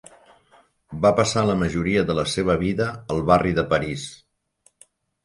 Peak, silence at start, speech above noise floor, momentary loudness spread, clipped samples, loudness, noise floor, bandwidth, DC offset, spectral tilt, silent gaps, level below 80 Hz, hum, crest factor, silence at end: -4 dBFS; 0.9 s; 42 dB; 10 LU; under 0.1%; -21 LUFS; -63 dBFS; 11.5 kHz; under 0.1%; -5.5 dB/octave; none; -44 dBFS; none; 20 dB; 1.1 s